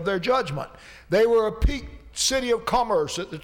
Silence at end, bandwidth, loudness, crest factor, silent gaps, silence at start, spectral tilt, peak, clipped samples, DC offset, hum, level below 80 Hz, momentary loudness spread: 0.05 s; 18.5 kHz; -23 LUFS; 14 dB; none; 0 s; -3.5 dB/octave; -10 dBFS; under 0.1%; under 0.1%; none; -34 dBFS; 14 LU